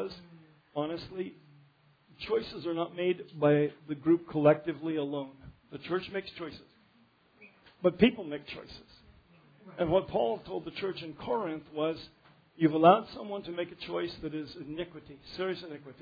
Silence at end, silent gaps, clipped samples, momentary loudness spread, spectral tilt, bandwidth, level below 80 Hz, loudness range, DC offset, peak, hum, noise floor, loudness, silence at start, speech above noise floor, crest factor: 0.1 s; none; under 0.1%; 19 LU; -5 dB/octave; 5 kHz; -62 dBFS; 5 LU; under 0.1%; -8 dBFS; none; -65 dBFS; -31 LUFS; 0 s; 34 dB; 24 dB